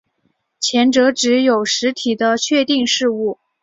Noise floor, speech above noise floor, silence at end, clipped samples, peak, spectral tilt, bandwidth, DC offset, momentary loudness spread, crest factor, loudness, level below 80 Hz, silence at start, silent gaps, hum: -66 dBFS; 51 dB; 0.3 s; under 0.1%; -2 dBFS; -2.5 dB/octave; 7.8 kHz; under 0.1%; 6 LU; 14 dB; -16 LUFS; -62 dBFS; 0.6 s; none; none